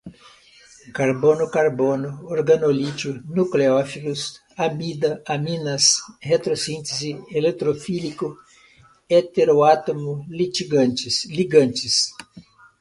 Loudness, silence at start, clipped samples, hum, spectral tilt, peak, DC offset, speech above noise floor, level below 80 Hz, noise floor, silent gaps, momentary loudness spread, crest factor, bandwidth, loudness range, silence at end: -21 LUFS; 0.05 s; under 0.1%; none; -4 dB/octave; -2 dBFS; under 0.1%; 32 dB; -60 dBFS; -53 dBFS; none; 11 LU; 20 dB; 11.5 kHz; 3 LU; 0.4 s